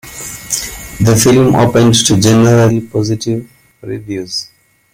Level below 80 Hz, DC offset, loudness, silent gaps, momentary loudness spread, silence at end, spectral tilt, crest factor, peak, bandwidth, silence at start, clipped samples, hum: -38 dBFS; under 0.1%; -11 LUFS; none; 16 LU; 0.5 s; -5 dB/octave; 12 dB; 0 dBFS; 17 kHz; 0.05 s; under 0.1%; none